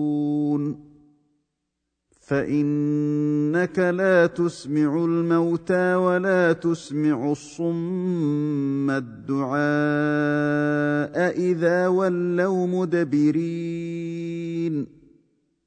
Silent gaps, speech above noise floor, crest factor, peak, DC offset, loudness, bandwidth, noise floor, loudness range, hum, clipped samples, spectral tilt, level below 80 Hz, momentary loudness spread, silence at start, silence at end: none; 57 dB; 16 dB; -6 dBFS; under 0.1%; -23 LUFS; 9.2 kHz; -79 dBFS; 4 LU; none; under 0.1%; -7.5 dB/octave; -64 dBFS; 8 LU; 0 s; 0.8 s